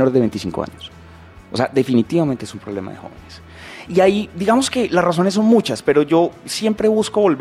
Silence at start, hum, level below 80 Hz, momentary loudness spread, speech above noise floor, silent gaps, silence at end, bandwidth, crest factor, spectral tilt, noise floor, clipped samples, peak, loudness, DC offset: 0 s; none; -50 dBFS; 19 LU; 24 dB; none; 0 s; 14.5 kHz; 14 dB; -5.5 dB/octave; -41 dBFS; under 0.1%; -2 dBFS; -17 LUFS; under 0.1%